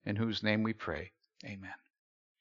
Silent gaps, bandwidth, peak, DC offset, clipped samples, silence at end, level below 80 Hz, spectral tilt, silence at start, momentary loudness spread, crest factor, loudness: none; 7.4 kHz; -14 dBFS; under 0.1%; under 0.1%; 0.65 s; -64 dBFS; -4.5 dB/octave; 0.05 s; 19 LU; 24 dB; -35 LUFS